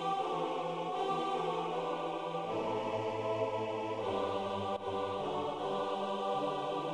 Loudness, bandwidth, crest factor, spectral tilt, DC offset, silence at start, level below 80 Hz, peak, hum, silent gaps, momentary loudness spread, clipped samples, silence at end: -36 LUFS; 11.5 kHz; 14 dB; -5.5 dB/octave; under 0.1%; 0 s; -72 dBFS; -22 dBFS; none; none; 2 LU; under 0.1%; 0 s